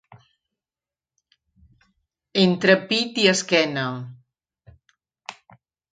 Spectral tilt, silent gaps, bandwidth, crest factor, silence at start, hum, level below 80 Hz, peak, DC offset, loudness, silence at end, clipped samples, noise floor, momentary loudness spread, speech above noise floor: -4 dB/octave; none; 9.4 kHz; 24 dB; 2.35 s; none; -66 dBFS; -2 dBFS; under 0.1%; -20 LUFS; 0.6 s; under 0.1%; under -90 dBFS; 23 LU; over 70 dB